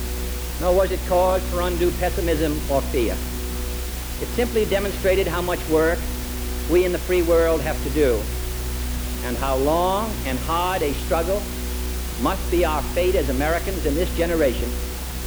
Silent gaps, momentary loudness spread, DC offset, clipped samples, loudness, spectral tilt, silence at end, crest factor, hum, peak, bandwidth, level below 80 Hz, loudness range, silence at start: none; 8 LU; under 0.1%; under 0.1%; -22 LUFS; -5 dB/octave; 0 s; 14 dB; none; -6 dBFS; over 20 kHz; -28 dBFS; 2 LU; 0 s